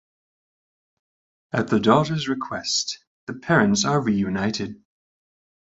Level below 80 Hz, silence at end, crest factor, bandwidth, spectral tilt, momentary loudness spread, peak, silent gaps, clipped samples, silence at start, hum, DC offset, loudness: -56 dBFS; 0.85 s; 22 dB; 8 kHz; -4.5 dB/octave; 14 LU; -2 dBFS; 3.07-3.27 s; under 0.1%; 1.55 s; none; under 0.1%; -22 LUFS